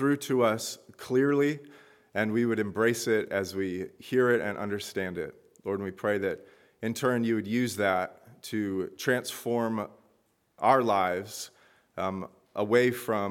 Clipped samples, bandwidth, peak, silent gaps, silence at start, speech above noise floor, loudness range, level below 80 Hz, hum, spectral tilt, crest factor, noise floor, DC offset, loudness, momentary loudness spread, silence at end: under 0.1%; 17.5 kHz; -8 dBFS; none; 0 s; 42 dB; 2 LU; -72 dBFS; none; -5 dB/octave; 20 dB; -70 dBFS; under 0.1%; -29 LUFS; 14 LU; 0 s